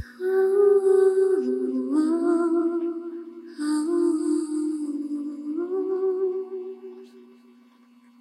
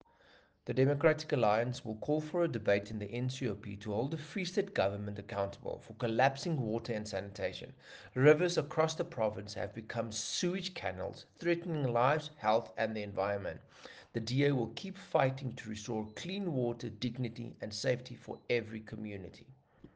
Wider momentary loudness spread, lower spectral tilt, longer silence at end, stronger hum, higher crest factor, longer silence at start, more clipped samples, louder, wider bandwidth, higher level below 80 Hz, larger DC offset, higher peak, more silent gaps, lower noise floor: first, 16 LU vs 13 LU; about the same, -5 dB/octave vs -5.5 dB/octave; first, 0.95 s vs 0.1 s; neither; second, 14 dB vs 22 dB; second, 0 s vs 0.65 s; neither; first, -24 LUFS vs -35 LUFS; first, 11.5 kHz vs 10 kHz; second, -74 dBFS vs -68 dBFS; neither; about the same, -10 dBFS vs -12 dBFS; neither; second, -55 dBFS vs -65 dBFS